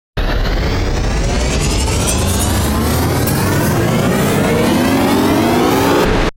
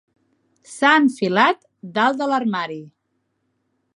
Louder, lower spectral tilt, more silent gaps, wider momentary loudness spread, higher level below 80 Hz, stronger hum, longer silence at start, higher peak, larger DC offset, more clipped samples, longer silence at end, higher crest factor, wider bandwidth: first, -14 LUFS vs -18 LUFS; about the same, -5 dB/octave vs -4.5 dB/octave; neither; second, 5 LU vs 15 LU; first, -20 dBFS vs -72 dBFS; neither; second, 0.15 s vs 0.7 s; about the same, -2 dBFS vs -2 dBFS; neither; neither; second, 0.05 s vs 1.05 s; second, 12 dB vs 20 dB; first, 16 kHz vs 11.5 kHz